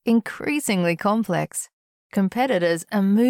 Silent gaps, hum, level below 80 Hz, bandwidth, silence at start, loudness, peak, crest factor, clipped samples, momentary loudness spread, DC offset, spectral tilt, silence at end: 1.73-2.10 s; none; -64 dBFS; 18 kHz; 0.05 s; -23 LUFS; -10 dBFS; 12 dB; under 0.1%; 8 LU; under 0.1%; -5.5 dB/octave; 0 s